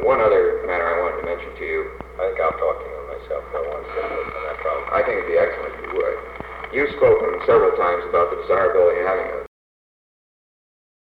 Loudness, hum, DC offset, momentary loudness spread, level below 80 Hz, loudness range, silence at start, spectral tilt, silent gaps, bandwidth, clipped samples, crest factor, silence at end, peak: -21 LUFS; none; under 0.1%; 13 LU; -44 dBFS; 7 LU; 0 s; -7 dB/octave; none; 5 kHz; under 0.1%; 16 dB; 1.7 s; -6 dBFS